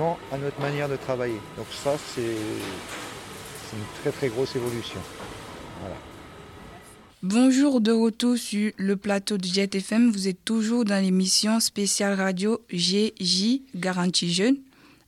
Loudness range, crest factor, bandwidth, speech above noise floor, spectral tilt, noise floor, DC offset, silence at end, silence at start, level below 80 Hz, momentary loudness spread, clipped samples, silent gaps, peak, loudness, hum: 9 LU; 16 dB; 15.5 kHz; 23 dB; -4 dB/octave; -48 dBFS; under 0.1%; 0.45 s; 0 s; -58 dBFS; 18 LU; under 0.1%; none; -10 dBFS; -24 LUFS; none